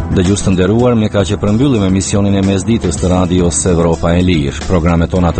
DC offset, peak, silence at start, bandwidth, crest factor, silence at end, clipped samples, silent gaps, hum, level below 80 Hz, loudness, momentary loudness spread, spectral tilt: under 0.1%; 0 dBFS; 0 s; 8.8 kHz; 10 dB; 0 s; under 0.1%; none; none; -26 dBFS; -12 LUFS; 3 LU; -6 dB/octave